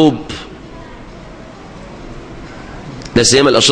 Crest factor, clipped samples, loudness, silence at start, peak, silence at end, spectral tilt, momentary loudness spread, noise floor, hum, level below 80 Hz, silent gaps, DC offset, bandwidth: 16 dB; under 0.1%; -11 LUFS; 0 s; 0 dBFS; 0 s; -3.5 dB/octave; 25 LU; -33 dBFS; none; -38 dBFS; none; under 0.1%; 10.5 kHz